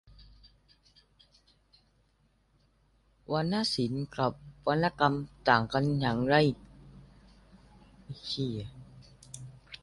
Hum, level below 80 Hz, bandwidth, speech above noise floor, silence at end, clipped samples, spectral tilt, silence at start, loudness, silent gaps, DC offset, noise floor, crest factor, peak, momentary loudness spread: 50 Hz at -55 dBFS; -58 dBFS; 11.5 kHz; 41 dB; 0.05 s; under 0.1%; -6 dB/octave; 3.3 s; -29 LUFS; none; under 0.1%; -69 dBFS; 26 dB; -8 dBFS; 21 LU